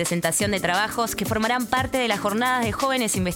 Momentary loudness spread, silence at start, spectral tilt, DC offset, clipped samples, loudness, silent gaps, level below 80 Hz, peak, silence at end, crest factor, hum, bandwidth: 2 LU; 0 s; -3.5 dB/octave; under 0.1%; under 0.1%; -23 LUFS; none; -46 dBFS; -8 dBFS; 0 s; 16 dB; none; 19 kHz